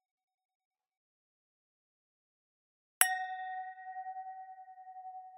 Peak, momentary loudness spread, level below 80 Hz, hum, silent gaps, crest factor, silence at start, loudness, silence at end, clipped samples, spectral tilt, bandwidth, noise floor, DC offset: -4 dBFS; 22 LU; under -90 dBFS; none; none; 38 dB; 3 s; -35 LUFS; 0 s; under 0.1%; 6 dB/octave; 8.2 kHz; under -90 dBFS; under 0.1%